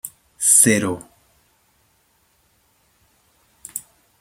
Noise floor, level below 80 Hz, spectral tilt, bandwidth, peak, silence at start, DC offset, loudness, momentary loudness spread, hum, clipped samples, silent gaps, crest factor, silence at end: -62 dBFS; -64 dBFS; -2.5 dB/octave; 16.5 kHz; 0 dBFS; 0.05 s; under 0.1%; -14 LUFS; 21 LU; none; under 0.1%; none; 24 dB; 0.4 s